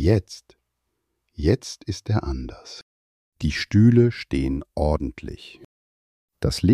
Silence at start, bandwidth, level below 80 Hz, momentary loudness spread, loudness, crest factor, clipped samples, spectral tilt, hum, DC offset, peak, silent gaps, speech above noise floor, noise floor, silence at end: 0 s; 12.5 kHz; -36 dBFS; 24 LU; -23 LUFS; 18 dB; under 0.1%; -7 dB/octave; none; under 0.1%; -4 dBFS; 2.82-3.32 s, 5.65-6.28 s; 56 dB; -77 dBFS; 0 s